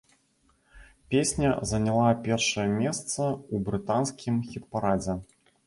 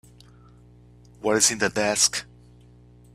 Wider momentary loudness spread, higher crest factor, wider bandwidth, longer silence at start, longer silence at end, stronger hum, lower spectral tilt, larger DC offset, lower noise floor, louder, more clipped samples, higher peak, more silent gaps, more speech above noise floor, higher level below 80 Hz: second, 7 LU vs 10 LU; about the same, 18 dB vs 22 dB; second, 11.5 kHz vs 15 kHz; second, 0.75 s vs 1.25 s; second, 0.4 s vs 0.9 s; second, none vs 60 Hz at -50 dBFS; first, -5 dB/octave vs -1.5 dB/octave; neither; first, -67 dBFS vs -51 dBFS; second, -27 LUFS vs -21 LUFS; neither; second, -10 dBFS vs -4 dBFS; neither; first, 41 dB vs 29 dB; first, -50 dBFS vs -56 dBFS